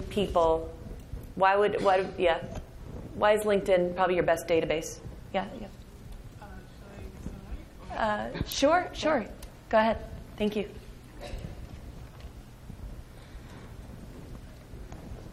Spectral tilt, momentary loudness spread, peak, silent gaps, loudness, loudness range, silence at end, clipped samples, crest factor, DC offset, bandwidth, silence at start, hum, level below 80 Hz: -5 dB/octave; 22 LU; -10 dBFS; none; -27 LUFS; 18 LU; 0 s; under 0.1%; 20 dB; under 0.1%; 15.5 kHz; 0 s; none; -46 dBFS